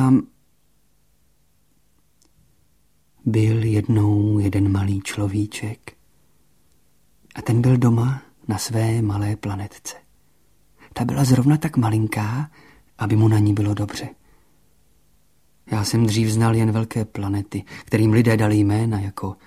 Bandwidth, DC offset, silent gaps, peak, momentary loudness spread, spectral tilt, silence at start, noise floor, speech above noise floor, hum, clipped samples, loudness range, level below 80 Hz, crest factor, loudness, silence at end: 15 kHz; 0.1%; none; -4 dBFS; 14 LU; -7 dB/octave; 0 s; -64 dBFS; 45 dB; none; under 0.1%; 5 LU; -50 dBFS; 18 dB; -20 LUFS; 0.1 s